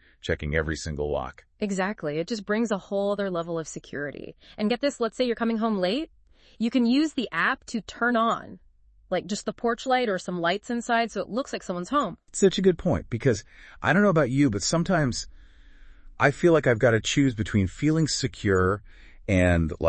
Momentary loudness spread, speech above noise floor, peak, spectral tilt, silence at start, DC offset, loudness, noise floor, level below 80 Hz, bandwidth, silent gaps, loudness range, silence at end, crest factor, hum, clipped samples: 11 LU; 24 dB; -6 dBFS; -5.5 dB/octave; 0.25 s; under 0.1%; -25 LUFS; -49 dBFS; -48 dBFS; 8.8 kHz; none; 5 LU; 0 s; 20 dB; none; under 0.1%